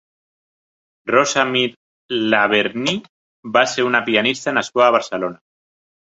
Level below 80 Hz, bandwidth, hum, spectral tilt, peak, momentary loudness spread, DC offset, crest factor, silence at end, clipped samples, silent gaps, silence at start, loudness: -64 dBFS; 8 kHz; none; -3 dB/octave; 0 dBFS; 10 LU; under 0.1%; 20 dB; 0.8 s; under 0.1%; 1.77-2.09 s, 3.09-3.43 s; 1.05 s; -17 LUFS